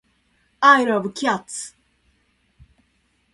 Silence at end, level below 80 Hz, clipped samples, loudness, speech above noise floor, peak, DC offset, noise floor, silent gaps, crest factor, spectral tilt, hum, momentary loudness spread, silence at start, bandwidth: 1.65 s; -64 dBFS; under 0.1%; -18 LUFS; 47 dB; -2 dBFS; under 0.1%; -65 dBFS; none; 22 dB; -3.5 dB/octave; none; 18 LU; 0.6 s; 11.5 kHz